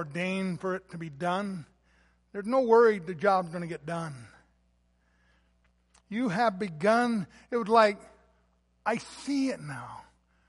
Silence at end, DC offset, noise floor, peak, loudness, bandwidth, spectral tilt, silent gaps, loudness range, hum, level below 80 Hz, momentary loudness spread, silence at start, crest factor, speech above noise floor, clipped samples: 0.45 s; under 0.1%; -69 dBFS; -8 dBFS; -28 LUFS; 11.5 kHz; -6 dB/octave; none; 6 LU; 60 Hz at -60 dBFS; -68 dBFS; 18 LU; 0 s; 22 dB; 41 dB; under 0.1%